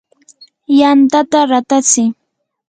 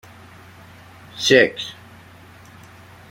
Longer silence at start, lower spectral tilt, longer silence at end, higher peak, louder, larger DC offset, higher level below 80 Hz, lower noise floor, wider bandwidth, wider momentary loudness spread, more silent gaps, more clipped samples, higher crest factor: second, 0.7 s vs 1.15 s; about the same, -2.5 dB/octave vs -3 dB/octave; second, 0.55 s vs 1.4 s; about the same, 0 dBFS vs -2 dBFS; first, -11 LUFS vs -17 LUFS; neither; about the same, -62 dBFS vs -60 dBFS; about the same, -45 dBFS vs -45 dBFS; second, 9.6 kHz vs 16.5 kHz; second, 4 LU vs 26 LU; neither; neither; second, 12 dB vs 22 dB